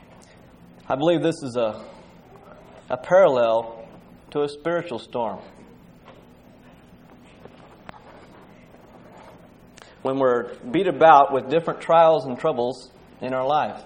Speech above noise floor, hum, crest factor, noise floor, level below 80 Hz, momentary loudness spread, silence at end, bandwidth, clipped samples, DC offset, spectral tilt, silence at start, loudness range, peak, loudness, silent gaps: 29 dB; none; 22 dB; -49 dBFS; -60 dBFS; 16 LU; 0.05 s; 10.5 kHz; under 0.1%; under 0.1%; -6 dB/octave; 0.9 s; 14 LU; -2 dBFS; -21 LUFS; none